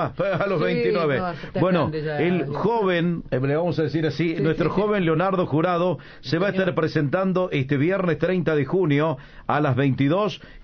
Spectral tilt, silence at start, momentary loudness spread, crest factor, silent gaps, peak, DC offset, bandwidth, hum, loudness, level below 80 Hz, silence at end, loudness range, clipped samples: -8.5 dB/octave; 0 s; 4 LU; 14 dB; none; -8 dBFS; under 0.1%; 6.6 kHz; none; -22 LUFS; -48 dBFS; 0 s; 1 LU; under 0.1%